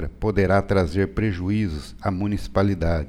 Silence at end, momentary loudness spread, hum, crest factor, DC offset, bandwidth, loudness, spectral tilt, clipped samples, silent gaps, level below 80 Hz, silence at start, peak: 0 s; 7 LU; none; 16 dB; under 0.1%; 11.5 kHz; -23 LUFS; -8 dB/octave; under 0.1%; none; -34 dBFS; 0 s; -6 dBFS